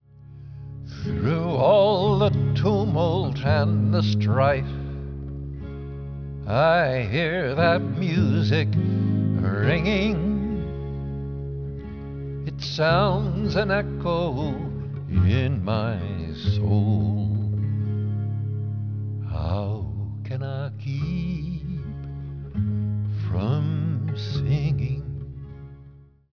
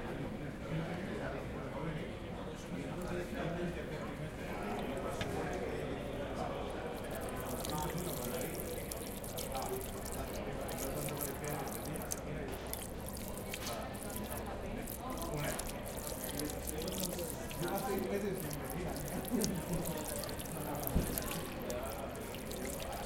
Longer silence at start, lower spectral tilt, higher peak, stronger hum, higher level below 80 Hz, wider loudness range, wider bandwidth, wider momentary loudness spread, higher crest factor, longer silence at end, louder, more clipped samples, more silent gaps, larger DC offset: first, 0.2 s vs 0 s; first, -8.5 dB/octave vs -4.5 dB/octave; first, -6 dBFS vs -14 dBFS; neither; first, -40 dBFS vs -50 dBFS; first, 7 LU vs 3 LU; second, 5.4 kHz vs 17 kHz; first, 14 LU vs 5 LU; second, 16 dB vs 26 dB; first, 0.3 s vs 0 s; first, -24 LUFS vs -40 LUFS; neither; neither; first, 0.2% vs under 0.1%